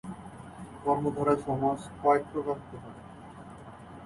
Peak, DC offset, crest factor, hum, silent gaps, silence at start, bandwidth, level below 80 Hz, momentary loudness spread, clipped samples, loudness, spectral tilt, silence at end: -12 dBFS; under 0.1%; 20 dB; none; none; 0.05 s; 11.5 kHz; -58 dBFS; 21 LU; under 0.1%; -29 LUFS; -7.5 dB/octave; 0 s